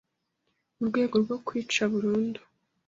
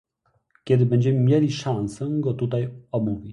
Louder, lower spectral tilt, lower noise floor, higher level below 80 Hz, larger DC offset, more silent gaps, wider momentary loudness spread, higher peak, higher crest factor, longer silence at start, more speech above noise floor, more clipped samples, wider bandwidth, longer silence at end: second, -28 LUFS vs -23 LUFS; second, -5 dB/octave vs -8 dB/octave; first, -78 dBFS vs -69 dBFS; second, -68 dBFS vs -54 dBFS; neither; neither; about the same, 8 LU vs 8 LU; second, -12 dBFS vs -8 dBFS; about the same, 18 dB vs 16 dB; first, 0.8 s vs 0.65 s; first, 51 dB vs 47 dB; neither; second, 7.8 kHz vs 10.5 kHz; first, 0.5 s vs 0 s